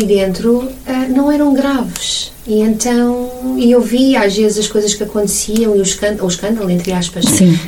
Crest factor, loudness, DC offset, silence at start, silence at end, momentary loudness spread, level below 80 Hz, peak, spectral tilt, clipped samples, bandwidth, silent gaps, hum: 12 dB; -13 LUFS; under 0.1%; 0 s; 0 s; 6 LU; -38 dBFS; 0 dBFS; -4.5 dB/octave; under 0.1%; 17.5 kHz; none; none